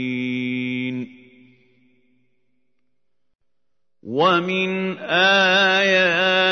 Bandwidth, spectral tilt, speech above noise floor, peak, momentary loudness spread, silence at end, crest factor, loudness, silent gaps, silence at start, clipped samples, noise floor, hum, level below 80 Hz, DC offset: 6.6 kHz; -4.5 dB/octave; 64 dB; -4 dBFS; 13 LU; 0 s; 18 dB; -18 LUFS; none; 0 s; under 0.1%; -82 dBFS; none; -74 dBFS; under 0.1%